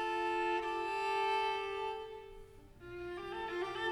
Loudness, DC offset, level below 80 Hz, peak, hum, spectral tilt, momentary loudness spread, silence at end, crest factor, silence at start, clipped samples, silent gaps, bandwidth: -37 LUFS; under 0.1%; -62 dBFS; -26 dBFS; none; -4 dB/octave; 17 LU; 0 s; 12 dB; 0 s; under 0.1%; none; 14 kHz